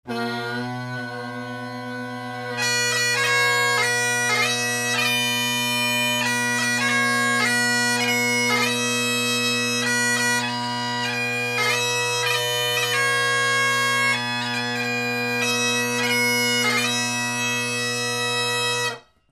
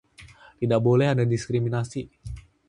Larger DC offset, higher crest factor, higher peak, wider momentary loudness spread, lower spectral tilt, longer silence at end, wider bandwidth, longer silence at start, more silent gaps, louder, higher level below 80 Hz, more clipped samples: neither; about the same, 16 dB vs 16 dB; about the same, -8 dBFS vs -8 dBFS; second, 9 LU vs 19 LU; second, -2 dB/octave vs -7.5 dB/octave; about the same, 0.3 s vs 0.3 s; first, 15.5 kHz vs 11 kHz; second, 0.05 s vs 0.2 s; neither; first, -20 LUFS vs -24 LUFS; second, -68 dBFS vs -48 dBFS; neither